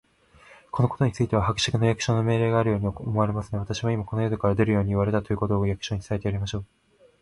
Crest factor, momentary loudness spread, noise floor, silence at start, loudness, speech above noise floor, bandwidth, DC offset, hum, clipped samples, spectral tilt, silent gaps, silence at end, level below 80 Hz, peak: 18 dB; 7 LU; -54 dBFS; 0.75 s; -25 LUFS; 30 dB; 11 kHz; under 0.1%; none; under 0.1%; -6.5 dB/octave; none; 0.55 s; -44 dBFS; -8 dBFS